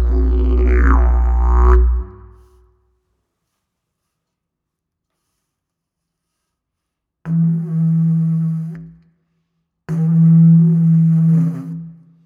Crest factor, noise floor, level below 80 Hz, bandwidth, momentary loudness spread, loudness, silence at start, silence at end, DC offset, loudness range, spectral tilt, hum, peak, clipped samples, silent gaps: 14 dB; -79 dBFS; -20 dBFS; 2.6 kHz; 17 LU; -15 LUFS; 0 s; 0.35 s; under 0.1%; 9 LU; -11 dB/octave; none; -2 dBFS; under 0.1%; none